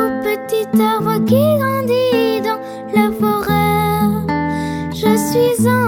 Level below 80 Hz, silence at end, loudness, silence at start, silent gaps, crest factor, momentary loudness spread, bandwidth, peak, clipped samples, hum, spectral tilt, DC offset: -42 dBFS; 0 s; -16 LUFS; 0 s; none; 12 dB; 6 LU; 19.5 kHz; -2 dBFS; under 0.1%; none; -6 dB/octave; under 0.1%